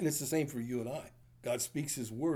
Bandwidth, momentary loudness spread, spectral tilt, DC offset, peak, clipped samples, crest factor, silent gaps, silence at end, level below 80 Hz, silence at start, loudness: over 20 kHz; 11 LU; -4.5 dB/octave; under 0.1%; -20 dBFS; under 0.1%; 16 dB; none; 0 s; -68 dBFS; 0 s; -37 LUFS